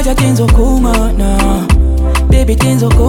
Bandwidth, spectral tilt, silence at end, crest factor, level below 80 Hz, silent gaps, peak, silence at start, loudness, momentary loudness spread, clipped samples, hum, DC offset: 17 kHz; -6 dB/octave; 0 s; 8 dB; -10 dBFS; none; 0 dBFS; 0 s; -11 LUFS; 3 LU; under 0.1%; none; under 0.1%